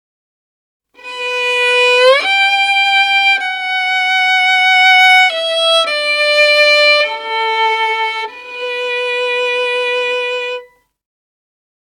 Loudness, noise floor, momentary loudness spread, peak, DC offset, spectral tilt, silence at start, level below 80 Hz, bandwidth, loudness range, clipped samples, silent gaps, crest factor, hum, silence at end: -11 LUFS; -34 dBFS; 12 LU; 0 dBFS; under 0.1%; 3 dB/octave; 1.05 s; -68 dBFS; 16.5 kHz; 8 LU; under 0.1%; none; 14 dB; none; 1.35 s